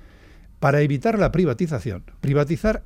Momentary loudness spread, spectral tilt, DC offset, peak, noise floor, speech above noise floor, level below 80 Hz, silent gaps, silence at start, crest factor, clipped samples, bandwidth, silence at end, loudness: 9 LU; -8 dB/octave; under 0.1%; -4 dBFS; -47 dBFS; 26 dB; -38 dBFS; none; 0.6 s; 18 dB; under 0.1%; 13.5 kHz; 0.05 s; -21 LUFS